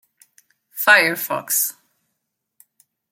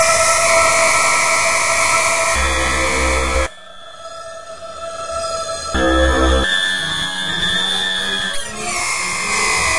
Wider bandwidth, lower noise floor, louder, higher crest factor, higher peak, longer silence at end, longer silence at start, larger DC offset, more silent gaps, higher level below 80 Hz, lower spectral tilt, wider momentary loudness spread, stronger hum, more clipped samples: first, 17 kHz vs 11.5 kHz; first, -77 dBFS vs -37 dBFS; about the same, -17 LUFS vs -15 LUFS; first, 22 dB vs 16 dB; about the same, 0 dBFS vs -2 dBFS; first, 1.4 s vs 0 s; first, 0.75 s vs 0 s; second, under 0.1% vs 3%; neither; second, -78 dBFS vs -28 dBFS; about the same, -1 dB/octave vs -2 dB/octave; second, 11 LU vs 16 LU; neither; neither